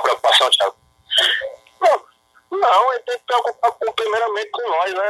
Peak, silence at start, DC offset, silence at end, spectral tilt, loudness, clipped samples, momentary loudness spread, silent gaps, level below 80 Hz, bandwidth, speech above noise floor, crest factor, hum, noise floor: -2 dBFS; 0 s; under 0.1%; 0 s; 0.5 dB/octave; -17 LUFS; under 0.1%; 9 LU; none; -68 dBFS; 13.5 kHz; 34 dB; 18 dB; none; -53 dBFS